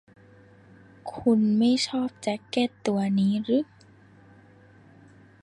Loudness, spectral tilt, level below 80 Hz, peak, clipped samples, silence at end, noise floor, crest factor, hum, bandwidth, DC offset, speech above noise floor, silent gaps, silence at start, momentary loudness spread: -25 LUFS; -6 dB/octave; -64 dBFS; -10 dBFS; under 0.1%; 1.8 s; -54 dBFS; 16 dB; none; 11 kHz; under 0.1%; 30 dB; none; 1.05 s; 11 LU